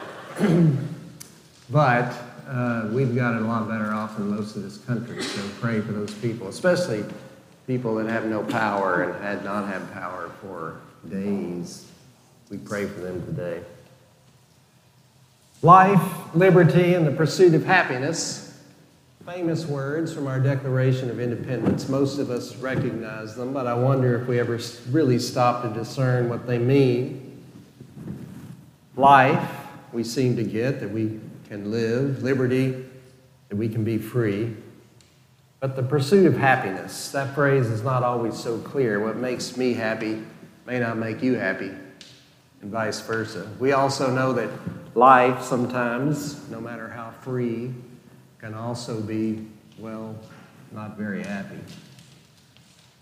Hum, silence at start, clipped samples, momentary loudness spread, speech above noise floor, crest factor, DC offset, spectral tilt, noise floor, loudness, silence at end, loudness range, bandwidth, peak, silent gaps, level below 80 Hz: none; 0 s; under 0.1%; 20 LU; 34 dB; 22 dB; under 0.1%; -6.5 dB/octave; -57 dBFS; -23 LUFS; 1 s; 12 LU; 15.5 kHz; 0 dBFS; none; -64 dBFS